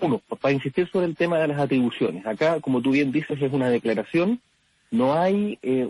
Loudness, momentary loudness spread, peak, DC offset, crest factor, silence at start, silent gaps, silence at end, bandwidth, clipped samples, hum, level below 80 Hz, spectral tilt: -23 LUFS; 4 LU; -10 dBFS; under 0.1%; 12 dB; 0 s; none; 0 s; 11.5 kHz; under 0.1%; none; -62 dBFS; -7.5 dB/octave